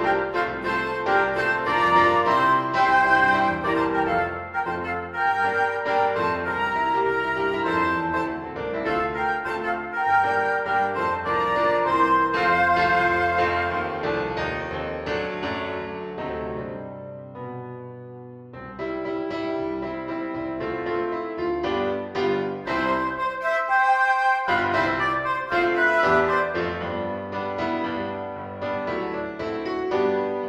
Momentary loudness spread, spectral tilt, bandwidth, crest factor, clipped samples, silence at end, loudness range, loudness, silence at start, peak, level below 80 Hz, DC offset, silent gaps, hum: 12 LU; -6 dB/octave; 12.5 kHz; 18 dB; under 0.1%; 0 s; 11 LU; -23 LUFS; 0 s; -6 dBFS; -52 dBFS; under 0.1%; none; none